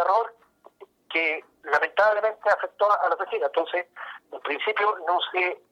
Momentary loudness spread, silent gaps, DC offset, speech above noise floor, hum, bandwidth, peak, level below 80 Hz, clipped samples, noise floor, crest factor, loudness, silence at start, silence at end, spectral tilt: 12 LU; none; under 0.1%; 31 dB; none; 8.2 kHz; -10 dBFS; -74 dBFS; under 0.1%; -56 dBFS; 16 dB; -24 LUFS; 0 s; 0.15 s; -2.5 dB/octave